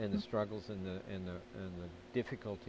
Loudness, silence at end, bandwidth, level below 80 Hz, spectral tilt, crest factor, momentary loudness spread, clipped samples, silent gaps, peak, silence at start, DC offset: -42 LUFS; 0 s; 8 kHz; -60 dBFS; -7.5 dB/octave; 18 dB; 9 LU; under 0.1%; none; -24 dBFS; 0 s; under 0.1%